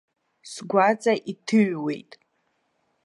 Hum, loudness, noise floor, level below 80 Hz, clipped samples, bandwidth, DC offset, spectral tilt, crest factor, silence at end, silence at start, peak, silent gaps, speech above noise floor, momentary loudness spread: none; -23 LUFS; -72 dBFS; -76 dBFS; under 0.1%; 11.5 kHz; under 0.1%; -5.5 dB/octave; 20 dB; 1.05 s; 0.45 s; -6 dBFS; none; 49 dB; 16 LU